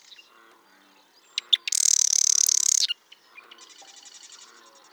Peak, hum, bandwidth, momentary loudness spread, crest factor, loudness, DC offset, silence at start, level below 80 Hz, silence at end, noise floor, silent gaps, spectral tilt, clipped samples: -6 dBFS; none; over 20 kHz; 16 LU; 22 dB; -20 LUFS; under 0.1%; 1.35 s; under -90 dBFS; 0.55 s; -58 dBFS; none; 6.5 dB/octave; under 0.1%